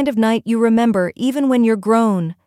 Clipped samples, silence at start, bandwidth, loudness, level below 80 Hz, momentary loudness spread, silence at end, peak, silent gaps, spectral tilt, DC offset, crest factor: under 0.1%; 0 s; 14 kHz; -16 LUFS; -58 dBFS; 4 LU; 0.15 s; -4 dBFS; none; -6.5 dB/octave; under 0.1%; 12 dB